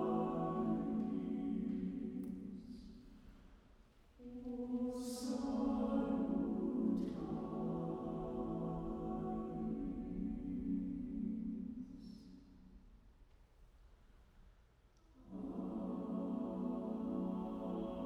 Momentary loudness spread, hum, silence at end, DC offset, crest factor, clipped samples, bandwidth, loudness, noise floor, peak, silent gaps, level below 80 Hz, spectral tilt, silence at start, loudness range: 15 LU; none; 0 s; under 0.1%; 16 dB; under 0.1%; 13.5 kHz; -42 LUFS; -68 dBFS; -26 dBFS; none; -60 dBFS; -8 dB/octave; 0 s; 11 LU